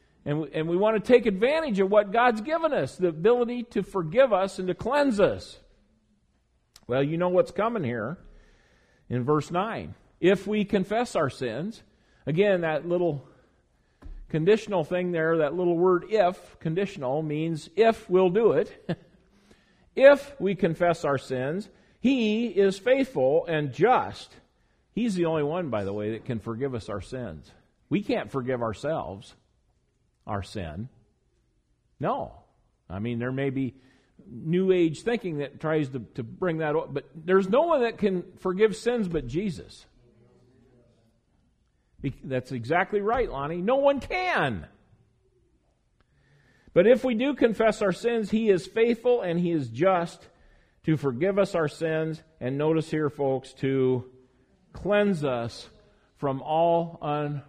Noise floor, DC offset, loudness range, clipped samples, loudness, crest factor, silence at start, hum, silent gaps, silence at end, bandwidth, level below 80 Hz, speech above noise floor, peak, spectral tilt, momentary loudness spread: -69 dBFS; under 0.1%; 8 LU; under 0.1%; -26 LUFS; 22 dB; 0.25 s; none; none; 0.05 s; 12 kHz; -54 dBFS; 44 dB; -4 dBFS; -7 dB/octave; 13 LU